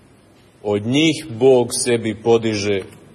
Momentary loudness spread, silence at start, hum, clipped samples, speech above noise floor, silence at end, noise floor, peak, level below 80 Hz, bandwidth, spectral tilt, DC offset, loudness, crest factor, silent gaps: 8 LU; 0.65 s; none; under 0.1%; 33 dB; 0.25 s; -50 dBFS; -4 dBFS; -58 dBFS; 12 kHz; -4.5 dB/octave; under 0.1%; -18 LUFS; 16 dB; none